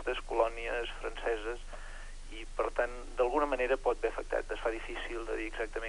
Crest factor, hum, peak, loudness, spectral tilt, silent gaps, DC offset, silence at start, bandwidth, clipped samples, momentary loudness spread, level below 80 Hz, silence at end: 20 dB; none; -14 dBFS; -35 LUFS; -4 dB/octave; none; under 0.1%; 0 s; 11 kHz; under 0.1%; 15 LU; -44 dBFS; 0 s